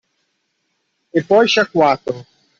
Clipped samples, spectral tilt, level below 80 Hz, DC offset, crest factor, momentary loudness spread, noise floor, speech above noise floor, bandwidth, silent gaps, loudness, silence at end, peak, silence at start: under 0.1%; -4.5 dB/octave; -62 dBFS; under 0.1%; 16 dB; 13 LU; -69 dBFS; 55 dB; 7.6 kHz; none; -15 LUFS; 0.35 s; -2 dBFS; 1.15 s